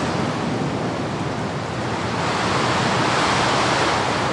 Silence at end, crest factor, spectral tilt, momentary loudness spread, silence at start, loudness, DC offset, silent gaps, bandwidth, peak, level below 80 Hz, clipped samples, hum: 0 s; 14 dB; -4.5 dB/octave; 7 LU; 0 s; -21 LUFS; under 0.1%; none; 11.5 kHz; -8 dBFS; -46 dBFS; under 0.1%; none